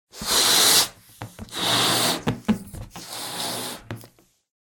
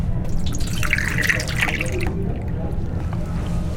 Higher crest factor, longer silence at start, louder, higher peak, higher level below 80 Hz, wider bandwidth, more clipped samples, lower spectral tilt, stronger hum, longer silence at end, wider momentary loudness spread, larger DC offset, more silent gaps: about the same, 20 dB vs 18 dB; first, 0.15 s vs 0 s; first, -20 LUFS vs -23 LUFS; about the same, -4 dBFS vs -2 dBFS; second, -50 dBFS vs -26 dBFS; about the same, 18 kHz vs 17 kHz; neither; second, -1.5 dB/octave vs -5 dB/octave; neither; first, 0.6 s vs 0 s; first, 24 LU vs 7 LU; neither; neither